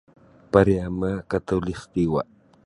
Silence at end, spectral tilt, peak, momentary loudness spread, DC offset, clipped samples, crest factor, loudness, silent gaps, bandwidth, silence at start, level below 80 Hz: 0.45 s; -8 dB/octave; -2 dBFS; 9 LU; under 0.1%; under 0.1%; 22 dB; -23 LUFS; none; 11 kHz; 0.55 s; -42 dBFS